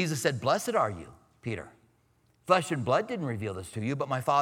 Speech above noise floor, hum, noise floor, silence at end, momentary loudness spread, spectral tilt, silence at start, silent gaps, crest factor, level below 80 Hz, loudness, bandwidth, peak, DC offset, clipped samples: 39 dB; none; -68 dBFS; 0 s; 16 LU; -5 dB/octave; 0 s; none; 22 dB; -64 dBFS; -30 LUFS; 18 kHz; -8 dBFS; under 0.1%; under 0.1%